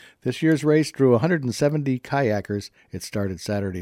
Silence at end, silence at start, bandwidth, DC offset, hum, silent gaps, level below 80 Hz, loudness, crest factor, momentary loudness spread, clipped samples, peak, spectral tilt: 0 s; 0.25 s; 15.5 kHz; under 0.1%; none; none; -58 dBFS; -23 LUFS; 18 dB; 12 LU; under 0.1%; -6 dBFS; -6.5 dB/octave